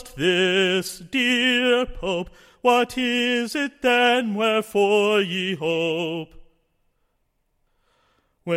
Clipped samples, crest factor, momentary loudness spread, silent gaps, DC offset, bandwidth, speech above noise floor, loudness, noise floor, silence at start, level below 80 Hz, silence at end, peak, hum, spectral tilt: under 0.1%; 18 dB; 9 LU; none; under 0.1%; 16.5 kHz; 49 dB; -21 LUFS; -71 dBFS; 0 s; -50 dBFS; 0 s; -6 dBFS; none; -4 dB/octave